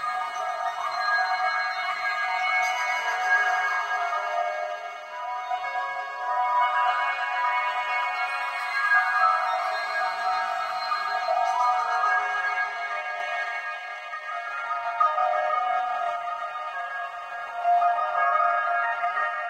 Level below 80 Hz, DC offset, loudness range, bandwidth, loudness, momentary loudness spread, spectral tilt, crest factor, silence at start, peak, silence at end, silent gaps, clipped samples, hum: -74 dBFS; under 0.1%; 3 LU; 14 kHz; -25 LUFS; 9 LU; 1 dB/octave; 16 dB; 0 s; -10 dBFS; 0 s; none; under 0.1%; none